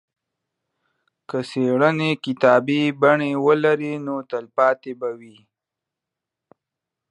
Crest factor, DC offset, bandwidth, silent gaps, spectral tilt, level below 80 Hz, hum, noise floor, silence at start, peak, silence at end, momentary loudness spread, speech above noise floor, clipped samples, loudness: 20 dB; under 0.1%; 10.5 kHz; none; -7 dB/octave; -74 dBFS; none; -86 dBFS; 1.35 s; -2 dBFS; 1.85 s; 12 LU; 66 dB; under 0.1%; -20 LUFS